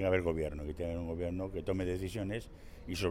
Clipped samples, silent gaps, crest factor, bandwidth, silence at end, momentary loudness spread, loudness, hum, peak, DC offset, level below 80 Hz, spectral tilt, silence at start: under 0.1%; none; 18 dB; 16 kHz; 0 s; 9 LU; -37 LUFS; none; -18 dBFS; under 0.1%; -48 dBFS; -6.5 dB/octave; 0 s